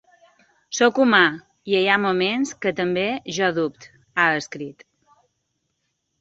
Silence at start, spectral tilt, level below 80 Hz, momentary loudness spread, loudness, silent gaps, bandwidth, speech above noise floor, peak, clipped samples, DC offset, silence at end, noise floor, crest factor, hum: 0.7 s; -4 dB/octave; -66 dBFS; 15 LU; -20 LUFS; none; 8 kHz; 54 dB; -2 dBFS; under 0.1%; under 0.1%; 1.5 s; -75 dBFS; 20 dB; none